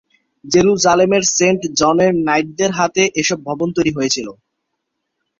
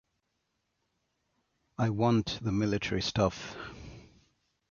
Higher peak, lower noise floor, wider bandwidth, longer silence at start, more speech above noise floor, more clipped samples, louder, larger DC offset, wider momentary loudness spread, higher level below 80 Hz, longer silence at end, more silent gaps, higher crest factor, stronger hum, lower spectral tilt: first, 0 dBFS vs -12 dBFS; second, -74 dBFS vs -80 dBFS; about the same, 7.8 kHz vs 7.2 kHz; second, 0.45 s vs 1.8 s; first, 59 dB vs 50 dB; neither; first, -15 LUFS vs -30 LUFS; neither; second, 6 LU vs 19 LU; about the same, -52 dBFS vs -54 dBFS; first, 1.05 s vs 0.65 s; neither; second, 16 dB vs 22 dB; neither; second, -3.5 dB/octave vs -6 dB/octave